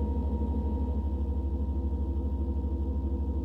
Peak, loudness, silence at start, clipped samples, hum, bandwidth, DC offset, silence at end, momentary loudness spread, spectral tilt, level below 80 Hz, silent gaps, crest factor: -20 dBFS; -32 LUFS; 0 s; under 0.1%; none; 3 kHz; under 0.1%; 0 s; 1 LU; -11.5 dB/octave; -30 dBFS; none; 8 dB